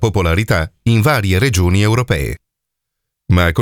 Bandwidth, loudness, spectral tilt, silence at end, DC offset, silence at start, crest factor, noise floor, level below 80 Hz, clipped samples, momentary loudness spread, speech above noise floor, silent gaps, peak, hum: 17.5 kHz; -15 LUFS; -6 dB/octave; 0 s; under 0.1%; 0 s; 14 dB; -78 dBFS; -30 dBFS; under 0.1%; 6 LU; 65 dB; none; 0 dBFS; none